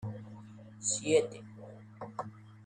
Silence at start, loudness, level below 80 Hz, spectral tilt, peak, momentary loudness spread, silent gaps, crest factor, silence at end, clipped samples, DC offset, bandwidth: 0 s; -33 LUFS; -74 dBFS; -3.5 dB/octave; -14 dBFS; 22 LU; none; 22 dB; 0 s; under 0.1%; under 0.1%; 10.5 kHz